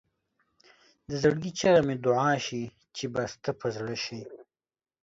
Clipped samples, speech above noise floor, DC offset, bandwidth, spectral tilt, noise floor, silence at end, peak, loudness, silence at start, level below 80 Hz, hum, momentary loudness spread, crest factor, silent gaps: under 0.1%; over 62 dB; under 0.1%; 7.8 kHz; -5 dB/octave; under -90 dBFS; 0.6 s; -10 dBFS; -28 LUFS; 1.1 s; -62 dBFS; none; 14 LU; 20 dB; none